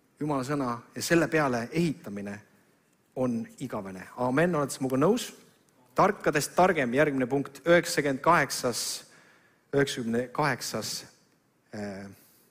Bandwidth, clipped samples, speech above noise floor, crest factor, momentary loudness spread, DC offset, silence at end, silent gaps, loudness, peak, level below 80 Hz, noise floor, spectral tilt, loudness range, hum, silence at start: 16 kHz; under 0.1%; 39 dB; 18 dB; 15 LU; under 0.1%; 0.35 s; none; -28 LUFS; -10 dBFS; -62 dBFS; -67 dBFS; -4.5 dB/octave; 6 LU; none; 0.2 s